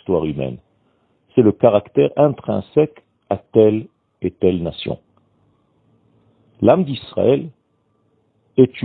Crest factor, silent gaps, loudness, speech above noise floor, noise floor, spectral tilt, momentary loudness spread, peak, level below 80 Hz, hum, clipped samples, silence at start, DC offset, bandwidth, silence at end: 18 dB; none; -18 LUFS; 48 dB; -64 dBFS; -11.5 dB/octave; 13 LU; 0 dBFS; -52 dBFS; none; under 0.1%; 0.1 s; under 0.1%; 4.5 kHz; 0 s